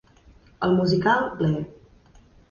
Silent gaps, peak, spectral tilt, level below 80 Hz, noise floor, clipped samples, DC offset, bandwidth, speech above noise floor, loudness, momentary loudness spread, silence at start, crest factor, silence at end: none; -8 dBFS; -7.5 dB/octave; -52 dBFS; -53 dBFS; under 0.1%; under 0.1%; 7.2 kHz; 32 dB; -23 LUFS; 9 LU; 0.6 s; 18 dB; 0.75 s